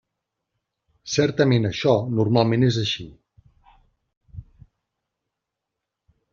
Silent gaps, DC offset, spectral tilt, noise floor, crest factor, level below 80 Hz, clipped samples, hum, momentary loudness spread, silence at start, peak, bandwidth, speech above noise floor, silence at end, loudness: 4.17-4.21 s; under 0.1%; -5.5 dB/octave; -83 dBFS; 22 dB; -54 dBFS; under 0.1%; none; 10 LU; 1.05 s; -4 dBFS; 7.4 kHz; 63 dB; 1.9 s; -21 LUFS